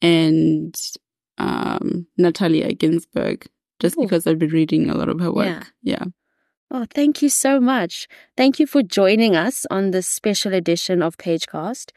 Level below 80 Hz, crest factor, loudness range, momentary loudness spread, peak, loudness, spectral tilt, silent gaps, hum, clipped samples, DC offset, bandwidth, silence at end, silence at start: -58 dBFS; 16 dB; 4 LU; 12 LU; -4 dBFS; -19 LUFS; -4.5 dB/octave; 6.57-6.67 s; none; under 0.1%; under 0.1%; 13.5 kHz; 0.15 s; 0 s